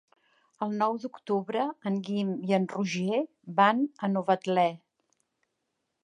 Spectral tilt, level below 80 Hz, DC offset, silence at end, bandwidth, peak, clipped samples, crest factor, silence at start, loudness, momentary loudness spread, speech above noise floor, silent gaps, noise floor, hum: -6.5 dB/octave; -82 dBFS; under 0.1%; 1.25 s; 9.8 kHz; -8 dBFS; under 0.1%; 22 dB; 0.6 s; -29 LUFS; 8 LU; 53 dB; none; -81 dBFS; none